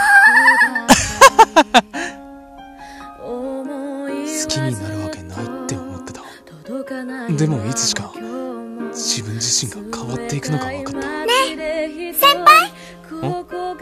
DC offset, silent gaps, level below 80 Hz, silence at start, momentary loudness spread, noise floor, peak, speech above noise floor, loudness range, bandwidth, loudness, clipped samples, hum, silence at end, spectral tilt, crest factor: under 0.1%; none; -46 dBFS; 0 s; 20 LU; -38 dBFS; 0 dBFS; 17 dB; 11 LU; 14.5 kHz; -15 LUFS; 0.1%; none; 0 s; -3 dB/octave; 18 dB